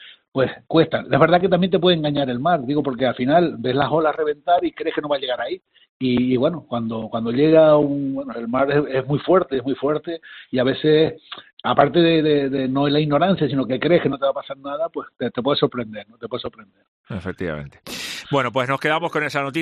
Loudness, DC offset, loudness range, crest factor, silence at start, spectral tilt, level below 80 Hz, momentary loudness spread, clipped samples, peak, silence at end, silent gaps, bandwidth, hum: -20 LUFS; under 0.1%; 7 LU; 20 dB; 0 s; -7 dB/octave; -56 dBFS; 14 LU; under 0.1%; 0 dBFS; 0 s; 0.28-0.32 s, 5.89-6.00 s, 11.53-11.57 s, 16.88-17.04 s; 12 kHz; none